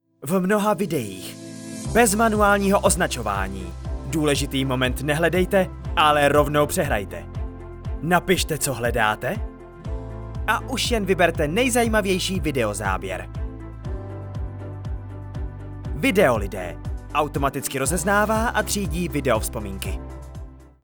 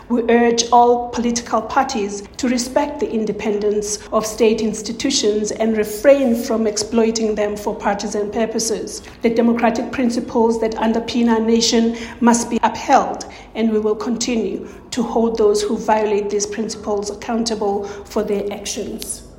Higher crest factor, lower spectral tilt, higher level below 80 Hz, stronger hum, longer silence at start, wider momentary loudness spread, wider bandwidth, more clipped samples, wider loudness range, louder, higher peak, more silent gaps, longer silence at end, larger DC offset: about the same, 20 dB vs 18 dB; about the same, -4.5 dB/octave vs -3.5 dB/octave; first, -34 dBFS vs -46 dBFS; neither; first, 0.2 s vs 0 s; first, 16 LU vs 9 LU; first, over 20 kHz vs 16.5 kHz; neither; about the same, 5 LU vs 3 LU; second, -22 LUFS vs -18 LUFS; second, -4 dBFS vs 0 dBFS; neither; about the same, 0.15 s vs 0.05 s; neither